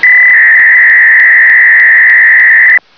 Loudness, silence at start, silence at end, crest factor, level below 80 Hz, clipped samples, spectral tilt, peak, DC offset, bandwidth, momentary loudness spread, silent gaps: -1 LUFS; 0 s; 0.2 s; 4 dB; -62 dBFS; 1%; -1 dB/octave; 0 dBFS; 0.3%; 5.4 kHz; 0 LU; none